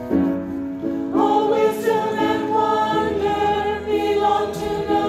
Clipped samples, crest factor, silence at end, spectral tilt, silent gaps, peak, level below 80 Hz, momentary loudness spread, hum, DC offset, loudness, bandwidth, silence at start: under 0.1%; 14 dB; 0 s; -6 dB/octave; none; -6 dBFS; -46 dBFS; 7 LU; none; under 0.1%; -20 LUFS; 14.5 kHz; 0 s